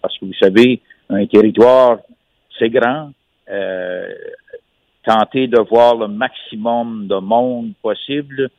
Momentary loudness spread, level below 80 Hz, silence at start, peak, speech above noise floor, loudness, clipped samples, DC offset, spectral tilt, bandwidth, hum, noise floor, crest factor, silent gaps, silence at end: 14 LU; -58 dBFS; 0.05 s; 0 dBFS; 34 dB; -15 LUFS; under 0.1%; under 0.1%; -7 dB/octave; 9.2 kHz; none; -48 dBFS; 14 dB; none; 0.1 s